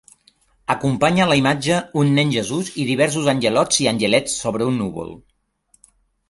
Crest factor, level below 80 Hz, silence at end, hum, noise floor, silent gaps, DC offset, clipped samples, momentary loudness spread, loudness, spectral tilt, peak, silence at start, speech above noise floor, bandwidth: 18 dB; -52 dBFS; 1.15 s; none; -61 dBFS; none; under 0.1%; under 0.1%; 8 LU; -18 LUFS; -4.5 dB/octave; -2 dBFS; 0.7 s; 43 dB; 11.5 kHz